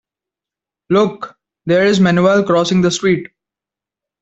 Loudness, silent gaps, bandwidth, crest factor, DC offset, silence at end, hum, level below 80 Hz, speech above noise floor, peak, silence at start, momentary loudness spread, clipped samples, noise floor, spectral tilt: -14 LUFS; none; 8.2 kHz; 14 dB; under 0.1%; 0.95 s; none; -54 dBFS; 74 dB; -2 dBFS; 0.9 s; 13 LU; under 0.1%; -87 dBFS; -5.5 dB/octave